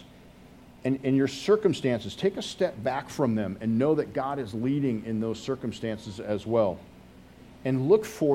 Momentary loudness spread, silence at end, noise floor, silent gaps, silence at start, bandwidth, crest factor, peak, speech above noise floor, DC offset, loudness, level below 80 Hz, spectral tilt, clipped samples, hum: 9 LU; 0 s; -51 dBFS; none; 0 s; 16 kHz; 18 dB; -8 dBFS; 24 dB; under 0.1%; -28 LUFS; -58 dBFS; -6.5 dB/octave; under 0.1%; none